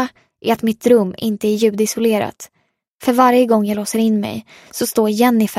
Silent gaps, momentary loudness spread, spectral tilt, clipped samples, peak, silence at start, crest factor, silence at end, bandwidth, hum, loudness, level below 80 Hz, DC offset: 2.90-2.98 s; 12 LU; -5 dB/octave; under 0.1%; 0 dBFS; 0 s; 16 dB; 0 s; 16 kHz; none; -16 LUFS; -60 dBFS; under 0.1%